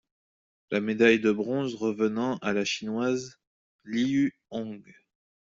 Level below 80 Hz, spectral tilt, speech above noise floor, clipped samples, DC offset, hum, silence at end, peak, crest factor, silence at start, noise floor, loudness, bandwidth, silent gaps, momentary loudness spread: -68 dBFS; -5 dB/octave; over 63 dB; under 0.1%; under 0.1%; none; 0.6 s; -8 dBFS; 20 dB; 0.7 s; under -90 dBFS; -27 LUFS; 7.8 kHz; 3.47-3.79 s; 15 LU